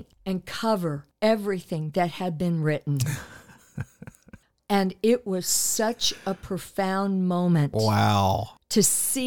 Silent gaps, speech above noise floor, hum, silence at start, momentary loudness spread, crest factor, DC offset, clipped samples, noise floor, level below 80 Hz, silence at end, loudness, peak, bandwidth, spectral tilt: none; 28 dB; none; 0 s; 11 LU; 18 dB; 0.3%; under 0.1%; -53 dBFS; -56 dBFS; 0 s; -25 LUFS; -6 dBFS; 19 kHz; -4.5 dB/octave